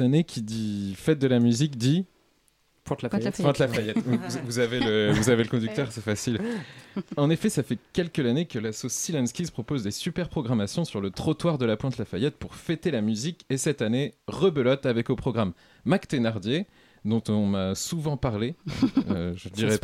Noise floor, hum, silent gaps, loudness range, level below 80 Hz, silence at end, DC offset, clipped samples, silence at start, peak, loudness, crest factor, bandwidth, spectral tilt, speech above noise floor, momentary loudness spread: -66 dBFS; none; none; 3 LU; -54 dBFS; 0.05 s; under 0.1%; under 0.1%; 0 s; -8 dBFS; -27 LUFS; 18 dB; 15.5 kHz; -5.5 dB/octave; 40 dB; 8 LU